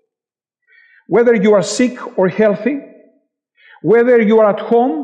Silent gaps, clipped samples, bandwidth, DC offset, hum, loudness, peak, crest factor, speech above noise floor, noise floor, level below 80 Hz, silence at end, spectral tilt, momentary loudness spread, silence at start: none; under 0.1%; 10 kHz; under 0.1%; none; -13 LUFS; -2 dBFS; 12 dB; 76 dB; -88 dBFS; -64 dBFS; 0 s; -6 dB/octave; 9 LU; 1.1 s